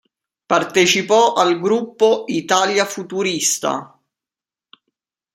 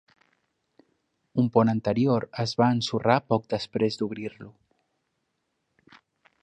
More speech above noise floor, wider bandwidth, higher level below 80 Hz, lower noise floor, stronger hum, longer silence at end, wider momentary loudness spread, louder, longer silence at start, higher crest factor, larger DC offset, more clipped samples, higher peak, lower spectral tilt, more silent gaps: first, 73 dB vs 53 dB; first, 16 kHz vs 9 kHz; about the same, -68 dBFS vs -64 dBFS; first, -90 dBFS vs -78 dBFS; neither; second, 1.5 s vs 1.9 s; about the same, 8 LU vs 9 LU; first, -17 LUFS vs -25 LUFS; second, 0.5 s vs 1.35 s; about the same, 18 dB vs 22 dB; neither; neither; first, 0 dBFS vs -6 dBFS; second, -2.5 dB/octave vs -6.5 dB/octave; neither